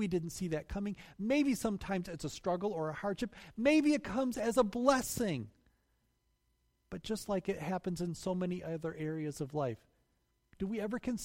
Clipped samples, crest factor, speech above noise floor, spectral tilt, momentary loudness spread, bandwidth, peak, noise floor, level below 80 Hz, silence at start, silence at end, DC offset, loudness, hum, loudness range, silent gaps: under 0.1%; 22 dB; 43 dB; -5.5 dB/octave; 11 LU; 16 kHz; -14 dBFS; -78 dBFS; -58 dBFS; 0 s; 0 s; under 0.1%; -35 LUFS; none; 7 LU; none